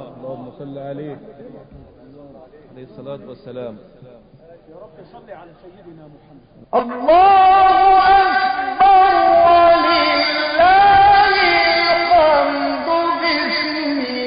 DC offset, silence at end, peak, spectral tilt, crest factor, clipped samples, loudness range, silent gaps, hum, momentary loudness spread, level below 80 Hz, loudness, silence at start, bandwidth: under 0.1%; 0 s; -2 dBFS; -8.5 dB/octave; 12 dB; under 0.1%; 22 LU; none; none; 22 LU; -44 dBFS; -13 LUFS; 0 s; 5.2 kHz